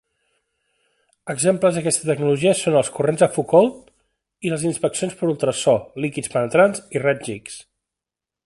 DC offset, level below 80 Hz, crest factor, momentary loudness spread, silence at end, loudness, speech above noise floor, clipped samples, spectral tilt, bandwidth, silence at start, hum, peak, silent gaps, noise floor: under 0.1%; -60 dBFS; 20 dB; 12 LU; 0.85 s; -20 LUFS; 68 dB; under 0.1%; -4.5 dB/octave; 12 kHz; 1.25 s; none; -2 dBFS; none; -87 dBFS